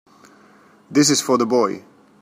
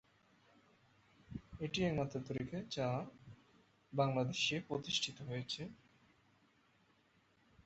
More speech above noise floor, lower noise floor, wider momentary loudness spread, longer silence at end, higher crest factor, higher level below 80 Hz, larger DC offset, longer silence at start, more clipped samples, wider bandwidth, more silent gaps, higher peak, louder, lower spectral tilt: about the same, 33 dB vs 34 dB; second, -51 dBFS vs -73 dBFS; second, 8 LU vs 16 LU; second, 0.45 s vs 1.9 s; about the same, 18 dB vs 22 dB; about the same, -66 dBFS vs -68 dBFS; neither; second, 0.9 s vs 1.3 s; neither; first, 15.5 kHz vs 8 kHz; neither; first, -4 dBFS vs -20 dBFS; first, -18 LUFS vs -40 LUFS; about the same, -3.5 dB/octave vs -4 dB/octave